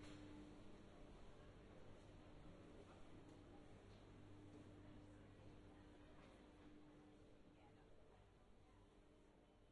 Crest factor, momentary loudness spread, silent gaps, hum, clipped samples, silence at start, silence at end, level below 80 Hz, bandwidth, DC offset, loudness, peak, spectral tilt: 14 dB; 5 LU; none; none; under 0.1%; 0 s; 0 s; -70 dBFS; 10.5 kHz; under 0.1%; -65 LUFS; -48 dBFS; -6.5 dB/octave